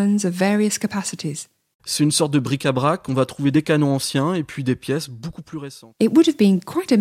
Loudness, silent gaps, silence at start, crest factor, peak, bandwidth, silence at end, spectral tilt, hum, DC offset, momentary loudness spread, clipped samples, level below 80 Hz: -20 LUFS; 1.74-1.79 s; 0 s; 16 dB; -4 dBFS; 15.5 kHz; 0 s; -5 dB/octave; none; under 0.1%; 17 LU; under 0.1%; -58 dBFS